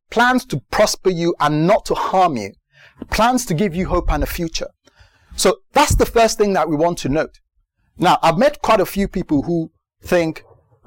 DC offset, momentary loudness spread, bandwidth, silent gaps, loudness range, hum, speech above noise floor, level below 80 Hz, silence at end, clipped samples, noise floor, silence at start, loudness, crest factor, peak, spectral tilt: under 0.1%; 10 LU; 17 kHz; none; 3 LU; none; 48 dB; -32 dBFS; 0.45 s; under 0.1%; -65 dBFS; 0.1 s; -17 LUFS; 12 dB; -6 dBFS; -4.5 dB/octave